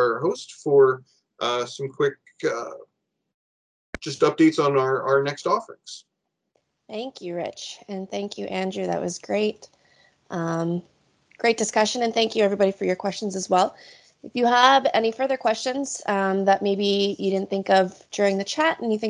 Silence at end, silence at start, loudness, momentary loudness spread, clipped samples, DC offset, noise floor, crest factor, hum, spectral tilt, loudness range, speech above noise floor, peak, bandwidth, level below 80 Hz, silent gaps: 0 s; 0 s; -23 LUFS; 14 LU; under 0.1%; under 0.1%; -73 dBFS; 22 dB; none; -4.5 dB/octave; 8 LU; 50 dB; -2 dBFS; 10.5 kHz; -66 dBFS; 3.34-3.93 s